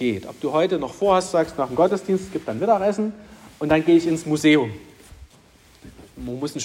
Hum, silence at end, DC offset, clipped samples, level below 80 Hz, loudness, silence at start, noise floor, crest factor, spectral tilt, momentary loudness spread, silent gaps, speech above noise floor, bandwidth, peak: none; 0 s; under 0.1%; under 0.1%; -52 dBFS; -21 LUFS; 0 s; -52 dBFS; 18 dB; -5.5 dB/octave; 13 LU; none; 32 dB; 15.5 kHz; -4 dBFS